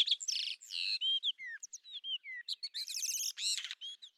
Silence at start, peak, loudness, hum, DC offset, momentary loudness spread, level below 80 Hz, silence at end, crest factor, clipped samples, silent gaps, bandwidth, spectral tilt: 0 s; -18 dBFS; -36 LUFS; none; under 0.1%; 13 LU; under -90 dBFS; 0.1 s; 20 dB; under 0.1%; none; 19.5 kHz; 9 dB/octave